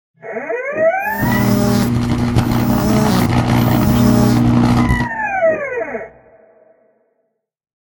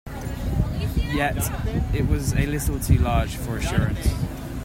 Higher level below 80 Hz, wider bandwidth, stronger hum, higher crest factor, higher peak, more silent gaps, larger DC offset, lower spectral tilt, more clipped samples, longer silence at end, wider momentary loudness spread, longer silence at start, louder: about the same, -30 dBFS vs -28 dBFS; about the same, 17.5 kHz vs 16.5 kHz; neither; about the same, 16 dB vs 18 dB; first, 0 dBFS vs -4 dBFS; neither; neither; about the same, -6.5 dB/octave vs -6 dB/octave; neither; first, 1.75 s vs 0 s; first, 11 LU vs 7 LU; first, 0.25 s vs 0.05 s; first, -15 LUFS vs -24 LUFS